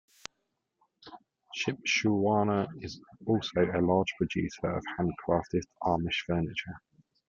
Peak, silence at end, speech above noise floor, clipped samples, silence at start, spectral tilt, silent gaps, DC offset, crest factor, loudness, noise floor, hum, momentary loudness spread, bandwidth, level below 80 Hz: -12 dBFS; 0.5 s; 51 dB; under 0.1%; 1.05 s; -5.5 dB/octave; none; under 0.1%; 18 dB; -30 LUFS; -81 dBFS; none; 16 LU; 7.8 kHz; -58 dBFS